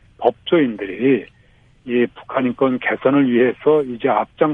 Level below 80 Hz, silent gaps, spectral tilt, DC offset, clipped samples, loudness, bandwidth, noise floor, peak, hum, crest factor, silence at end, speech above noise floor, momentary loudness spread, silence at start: -56 dBFS; none; -9 dB/octave; under 0.1%; under 0.1%; -18 LUFS; 3.8 kHz; -52 dBFS; 0 dBFS; none; 18 dB; 0 s; 35 dB; 6 LU; 0.2 s